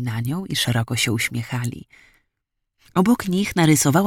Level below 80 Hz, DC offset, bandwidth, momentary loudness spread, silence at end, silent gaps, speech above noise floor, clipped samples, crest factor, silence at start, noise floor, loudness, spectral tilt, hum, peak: -52 dBFS; under 0.1%; 18.5 kHz; 11 LU; 0 s; none; 58 dB; under 0.1%; 18 dB; 0 s; -78 dBFS; -21 LUFS; -4.5 dB/octave; none; -2 dBFS